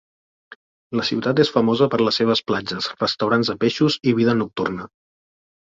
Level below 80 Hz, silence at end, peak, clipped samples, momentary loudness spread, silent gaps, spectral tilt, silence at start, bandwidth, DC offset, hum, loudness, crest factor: -58 dBFS; 0.95 s; -4 dBFS; under 0.1%; 8 LU; 0.55-0.90 s; -6 dB/octave; 0.5 s; 7.6 kHz; under 0.1%; none; -20 LUFS; 18 dB